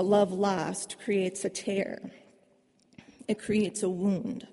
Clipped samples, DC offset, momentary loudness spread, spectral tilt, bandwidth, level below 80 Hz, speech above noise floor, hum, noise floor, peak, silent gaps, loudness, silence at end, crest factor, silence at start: under 0.1%; under 0.1%; 10 LU; -5 dB/octave; 11.5 kHz; -68 dBFS; 37 dB; none; -66 dBFS; -12 dBFS; none; -30 LUFS; 0.05 s; 18 dB; 0 s